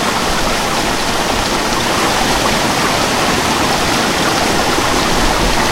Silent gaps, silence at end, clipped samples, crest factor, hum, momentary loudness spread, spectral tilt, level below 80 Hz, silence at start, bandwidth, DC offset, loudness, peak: none; 0 s; under 0.1%; 14 dB; none; 2 LU; -3 dB/octave; -26 dBFS; 0 s; 16 kHz; under 0.1%; -13 LUFS; 0 dBFS